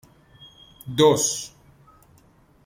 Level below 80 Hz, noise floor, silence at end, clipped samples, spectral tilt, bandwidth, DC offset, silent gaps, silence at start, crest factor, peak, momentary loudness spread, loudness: -60 dBFS; -56 dBFS; 1.2 s; under 0.1%; -3.5 dB/octave; 16.5 kHz; under 0.1%; none; 0.85 s; 22 dB; -4 dBFS; 22 LU; -21 LUFS